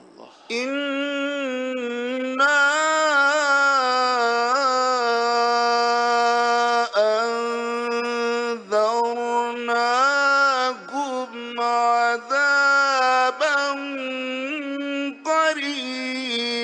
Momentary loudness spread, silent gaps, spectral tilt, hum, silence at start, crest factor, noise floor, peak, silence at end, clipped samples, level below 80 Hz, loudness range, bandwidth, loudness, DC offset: 10 LU; none; -1 dB/octave; none; 0.2 s; 14 dB; -46 dBFS; -8 dBFS; 0 s; under 0.1%; -82 dBFS; 3 LU; 10.5 kHz; -21 LUFS; under 0.1%